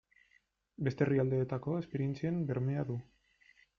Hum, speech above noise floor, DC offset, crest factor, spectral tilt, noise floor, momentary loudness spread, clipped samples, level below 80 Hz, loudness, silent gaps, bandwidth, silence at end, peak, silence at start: none; 39 dB; under 0.1%; 18 dB; -9.5 dB/octave; -73 dBFS; 7 LU; under 0.1%; -68 dBFS; -35 LUFS; none; 6.6 kHz; 0.75 s; -18 dBFS; 0.8 s